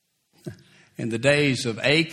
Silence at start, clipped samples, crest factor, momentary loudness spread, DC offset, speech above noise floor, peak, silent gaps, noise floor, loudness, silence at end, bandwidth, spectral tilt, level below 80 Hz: 0.45 s; under 0.1%; 20 dB; 22 LU; under 0.1%; 26 dB; -4 dBFS; none; -48 dBFS; -22 LUFS; 0 s; 14 kHz; -4.5 dB/octave; -58 dBFS